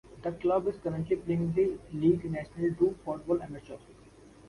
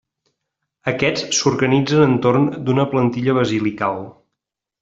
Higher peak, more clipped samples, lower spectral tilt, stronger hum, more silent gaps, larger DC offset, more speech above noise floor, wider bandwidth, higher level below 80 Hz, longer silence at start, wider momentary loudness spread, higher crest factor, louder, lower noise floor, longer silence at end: second, -14 dBFS vs -2 dBFS; neither; first, -9 dB/octave vs -5 dB/octave; neither; neither; neither; second, 25 dB vs 64 dB; first, 11 kHz vs 8 kHz; about the same, -56 dBFS vs -54 dBFS; second, 0.1 s vs 0.85 s; first, 12 LU vs 9 LU; about the same, 18 dB vs 16 dB; second, -31 LUFS vs -18 LUFS; second, -55 dBFS vs -82 dBFS; second, 0 s vs 0.7 s